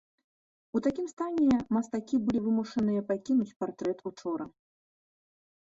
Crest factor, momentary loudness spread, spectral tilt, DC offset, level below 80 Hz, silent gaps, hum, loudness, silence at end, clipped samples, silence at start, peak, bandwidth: 16 dB; 10 LU; -7 dB/octave; under 0.1%; -62 dBFS; 1.13-1.17 s, 3.56-3.60 s; none; -30 LUFS; 1.2 s; under 0.1%; 0.75 s; -16 dBFS; 7.8 kHz